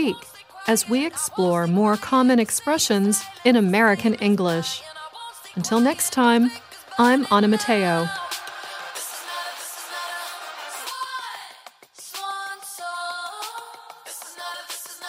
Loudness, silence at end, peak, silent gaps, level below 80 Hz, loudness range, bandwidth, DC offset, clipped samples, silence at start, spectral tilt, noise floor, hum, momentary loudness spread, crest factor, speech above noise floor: -22 LUFS; 0 s; -4 dBFS; none; -68 dBFS; 13 LU; 16 kHz; under 0.1%; under 0.1%; 0 s; -4 dB/octave; -47 dBFS; none; 18 LU; 20 dB; 27 dB